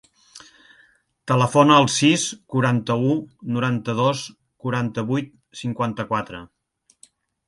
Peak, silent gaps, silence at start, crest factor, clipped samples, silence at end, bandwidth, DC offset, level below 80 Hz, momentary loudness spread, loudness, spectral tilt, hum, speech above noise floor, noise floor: -2 dBFS; none; 0.35 s; 20 dB; under 0.1%; 1 s; 11.5 kHz; under 0.1%; -60 dBFS; 17 LU; -21 LUFS; -5 dB/octave; none; 44 dB; -64 dBFS